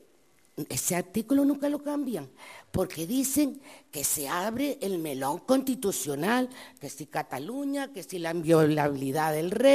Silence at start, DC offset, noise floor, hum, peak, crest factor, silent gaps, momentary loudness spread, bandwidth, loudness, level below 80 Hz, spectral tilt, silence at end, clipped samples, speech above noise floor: 0.55 s; under 0.1%; -64 dBFS; none; -8 dBFS; 20 dB; none; 13 LU; 15.5 kHz; -28 LUFS; -62 dBFS; -4.5 dB/octave; 0 s; under 0.1%; 36 dB